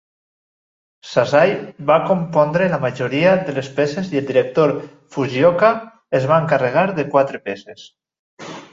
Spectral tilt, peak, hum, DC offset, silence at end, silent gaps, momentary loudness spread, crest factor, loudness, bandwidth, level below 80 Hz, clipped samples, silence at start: -6.5 dB/octave; -2 dBFS; none; under 0.1%; 0.1 s; 8.19-8.37 s; 13 LU; 16 dB; -17 LUFS; 7.8 kHz; -58 dBFS; under 0.1%; 1.05 s